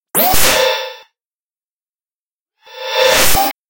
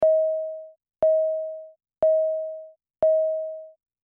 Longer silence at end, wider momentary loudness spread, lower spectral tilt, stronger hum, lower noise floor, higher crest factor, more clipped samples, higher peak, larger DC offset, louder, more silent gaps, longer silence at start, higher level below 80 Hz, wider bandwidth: second, 0 s vs 0.35 s; second, 14 LU vs 18 LU; second, -1 dB/octave vs -8.5 dB/octave; neither; first, under -90 dBFS vs -42 dBFS; about the same, 16 dB vs 12 dB; neither; first, 0 dBFS vs -12 dBFS; neither; first, -12 LUFS vs -24 LUFS; first, 1.27-1.31 s, 1.42-1.50 s, 1.63-1.81 s, 1.89-1.95 s, 2.01-2.05 s, 2.14-2.46 s, 3.58-3.64 s vs none; about the same, 0 s vs 0 s; first, -34 dBFS vs -64 dBFS; first, 17 kHz vs 2.3 kHz